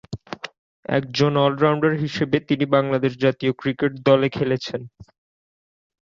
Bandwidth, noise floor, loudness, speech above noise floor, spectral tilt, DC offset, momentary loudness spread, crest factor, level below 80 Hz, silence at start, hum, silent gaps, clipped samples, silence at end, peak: 7.6 kHz; under -90 dBFS; -21 LUFS; over 70 dB; -7 dB/octave; under 0.1%; 15 LU; 18 dB; -58 dBFS; 0.1 s; none; 0.58-0.83 s; under 0.1%; 1 s; -2 dBFS